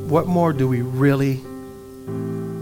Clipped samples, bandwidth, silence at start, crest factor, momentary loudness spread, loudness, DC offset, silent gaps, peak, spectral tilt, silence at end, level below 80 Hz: under 0.1%; 17 kHz; 0 s; 18 dB; 18 LU; -20 LUFS; under 0.1%; none; -4 dBFS; -8.5 dB/octave; 0 s; -50 dBFS